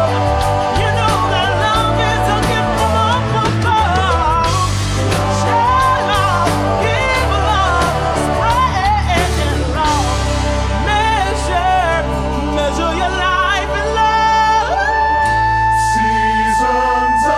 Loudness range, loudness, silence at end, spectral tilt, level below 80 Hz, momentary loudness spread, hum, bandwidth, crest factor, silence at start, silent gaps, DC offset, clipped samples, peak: 2 LU; -14 LUFS; 0 s; -4.5 dB/octave; -24 dBFS; 3 LU; none; 13.5 kHz; 12 dB; 0 s; none; under 0.1%; under 0.1%; -2 dBFS